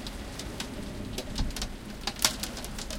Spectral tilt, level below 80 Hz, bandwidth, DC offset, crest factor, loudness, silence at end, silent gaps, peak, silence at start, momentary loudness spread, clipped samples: -2.5 dB/octave; -40 dBFS; 17 kHz; under 0.1%; 30 dB; -33 LUFS; 0 s; none; -4 dBFS; 0 s; 12 LU; under 0.1%